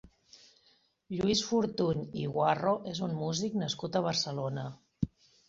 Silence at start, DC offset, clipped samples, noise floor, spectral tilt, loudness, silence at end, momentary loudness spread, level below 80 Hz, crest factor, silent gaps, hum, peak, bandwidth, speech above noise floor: 0.05 s; under 0.1%; under 0.1%; -69 dBFS; -5 dB/octave; -32 LUFS; 0.4 s; 9 LU; -60 dBFS; 18 dB; none; none; -14 dBFS; 8 kHz; 37 dB